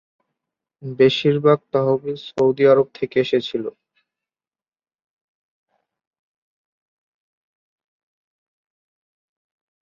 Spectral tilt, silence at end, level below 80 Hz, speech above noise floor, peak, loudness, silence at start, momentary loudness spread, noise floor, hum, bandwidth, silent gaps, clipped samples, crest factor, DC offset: -7 dB/octave; 6.2 s; -66 dBFS; over 72 dB; -2 dBFS; -18 LUFS; 0.85 s; 13 LU; under -90 dBFS; none; 7.2 kHz; none; under 0.1%; 22 dB; under 0.1%